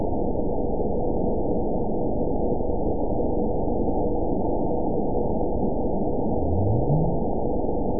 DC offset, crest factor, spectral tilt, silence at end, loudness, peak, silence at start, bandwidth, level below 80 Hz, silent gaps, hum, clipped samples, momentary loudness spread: 5%; 12 dB; -18.5 dB/octave; 0 s; -26 LUFS; -10 dBFS; 0 s; 1 kHz; -32 dBFS; none; none; under 0.1%; 3 LU